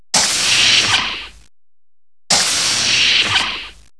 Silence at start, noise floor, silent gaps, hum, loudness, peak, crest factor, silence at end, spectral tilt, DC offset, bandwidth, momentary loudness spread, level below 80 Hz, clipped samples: 0.15 s; under -90 dBFS; none; none; -12 LUFS; 0 dBFS; 16 dB; 0.25 s; 0.5 dB/octave; 0.6%; 11 kHz; 12 LU; -46 dBFS; under 0.1%